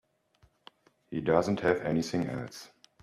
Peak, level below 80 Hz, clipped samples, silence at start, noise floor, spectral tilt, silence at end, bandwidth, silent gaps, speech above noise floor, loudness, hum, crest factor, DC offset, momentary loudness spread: -10 dBFS; -62 dBFS; under 0.1%; 1.1 s; -67 dBFS; -6 dB/octave; 0.35 s; 13.5 kHz; none; 38 dB; -30 LUFS; none; 22 dB; under 0.1%; 14 LU